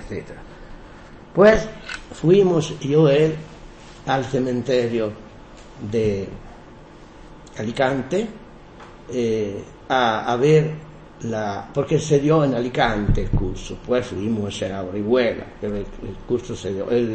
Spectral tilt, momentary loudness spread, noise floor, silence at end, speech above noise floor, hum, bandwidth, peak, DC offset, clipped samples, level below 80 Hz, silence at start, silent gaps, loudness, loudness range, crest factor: -6.5 dB/octave; 17 LU; -43 dBFS; 0 s; 22 dB; none; 8.8 kHz; -2 dBFS; under 0.1%; under 0.1%; -36 dBFS; 0 s; none; -21 LUFS; 8 LU; 20 dB